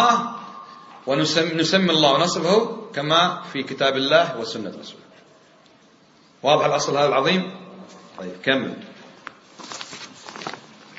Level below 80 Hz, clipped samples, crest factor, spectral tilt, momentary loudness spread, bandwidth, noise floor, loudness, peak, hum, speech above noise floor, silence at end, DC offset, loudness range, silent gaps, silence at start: -68 dBFS; under 0.1%; 20 dB; -4 dB/octave; 23 LU; 8 kHz; -54 dBFS; -20 LUFS; -2 dBFS; none; 33 dB; 0 s; under 0.1%; 7 LU; none; 0 s